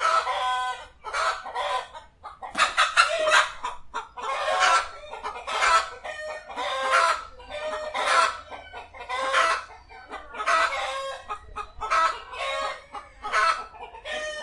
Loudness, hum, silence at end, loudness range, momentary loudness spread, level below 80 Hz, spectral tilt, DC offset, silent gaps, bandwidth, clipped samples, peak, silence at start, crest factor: -25 LUFS; none; 0 s; 4 LU; 18 LU; -54 dBFS; 0 dB/octave; under 0.1%; none; 11.5 kHz; under 0.1%; -2 dBFS; 0 s; 24 dB